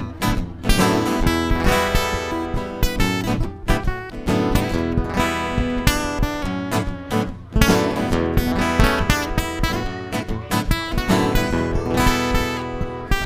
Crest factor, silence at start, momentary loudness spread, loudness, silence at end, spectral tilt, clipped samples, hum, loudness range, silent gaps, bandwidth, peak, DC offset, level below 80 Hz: 20 dB; 0 s; 7 LU; -21 LUFS; 0 s; -5 dB/octave; under 0.1%; none; 2 LU; none; 16 kHz; 0 dBFS; under 0.1%; -26 dBFS